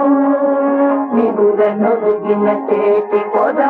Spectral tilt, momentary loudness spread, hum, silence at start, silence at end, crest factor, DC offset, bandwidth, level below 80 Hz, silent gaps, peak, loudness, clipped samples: -10 dB/octave; 2 LU; none; 0 s; 0 s; 12 dB; under 0.1%; 4 kHz; -64 dBFS; none; -2 dBFS; -14 LUFS; under 0.1%